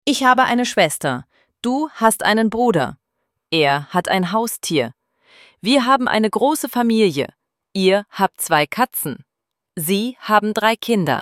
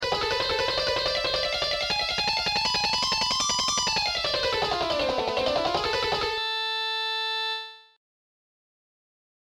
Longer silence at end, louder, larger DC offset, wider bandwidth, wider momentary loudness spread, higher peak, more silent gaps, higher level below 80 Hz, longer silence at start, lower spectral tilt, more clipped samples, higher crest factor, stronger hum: second, 0 s vs 1.75 s; first, -18 LUFS vs -25 LUFS; neither; about the same, 16.5 kHz vs 17 kHz; first, 11 LU vs 3 LU; first, 0 dBFS vs -12 dBFS; neither; second, -60 dBFS vs -50 dBFS; about the same, 0.05 s vs 0 s; first, -4 dB/octave vs -1.5 dB/octave; neither; about the same, 18 dB vs 14 dB; second, none vs 50 Hz at -65 dBFS